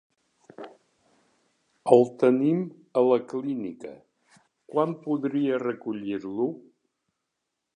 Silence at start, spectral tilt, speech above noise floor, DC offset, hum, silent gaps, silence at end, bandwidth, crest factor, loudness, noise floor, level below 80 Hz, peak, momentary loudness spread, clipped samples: 0.6 s; -8 dB/octave; 58 dB; under 0.1%; none; none; 1.15 s; 10 kHz; 26 dB; -26 LUFS; -82 dBFS; -78 dBFS; -2 dBFS; 23 LU; under 0.1%